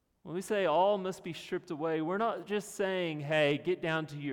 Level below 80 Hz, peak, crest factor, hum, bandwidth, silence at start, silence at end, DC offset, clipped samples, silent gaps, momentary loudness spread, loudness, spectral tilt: -72 dBFS; -16 dBFS; 16 dB; none; 18 kHz; 0.25 s; 0 s; under 0.1%; under 0.1%; none; 10 LU; -32 LUFS; -5.5 dB/octave